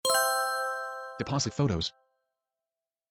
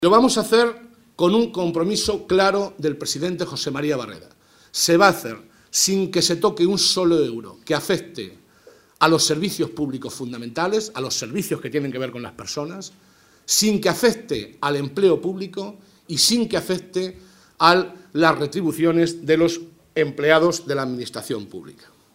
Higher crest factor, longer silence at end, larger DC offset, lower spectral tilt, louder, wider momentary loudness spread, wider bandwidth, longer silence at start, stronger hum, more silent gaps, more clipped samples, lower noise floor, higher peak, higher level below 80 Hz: about the same, 18 dB vs 22 dB; first, 1.2 s vs 0.45 s; neither; about the same, -3.5 dB/octave vs -3.5 dB/octave; second, -30 LUFS vs -20 LUFS; second, 11 LU vs 14 LU; about the same, 17 kHz vs 16 kHz; about the same, 0.05 s vs 0 s; neither; neither; neither; first, under -90 dBFS vs -51 dBFS; second, -14 dBFS vs 0 dBFS; about the same, -58 dBFS vs -56 dBFS